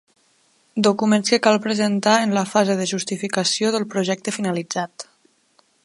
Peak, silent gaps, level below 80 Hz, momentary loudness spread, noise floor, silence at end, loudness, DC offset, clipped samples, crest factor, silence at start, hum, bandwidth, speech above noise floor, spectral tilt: 0 dBFS; none; -70 dBFS; 10 LU; -61 dBFS; 0.8 s; -20 LUFS; under 0.1%; under 0.1%; 20 dB; 0.75 s; none; 11.5 kHz; 41 dB; -4 dB/octave